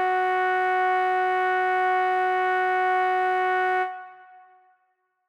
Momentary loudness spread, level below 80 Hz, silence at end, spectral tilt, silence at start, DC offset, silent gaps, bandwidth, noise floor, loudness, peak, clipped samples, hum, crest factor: 1 LU; -76 dBFS; 1.15 s; -3.5 dB/octave; 0 s; under 0.1%; none; 8.2 kHz; -72 dBFS; -23 LUFS; -16 dBFS; under 0.1%; none; 8 dB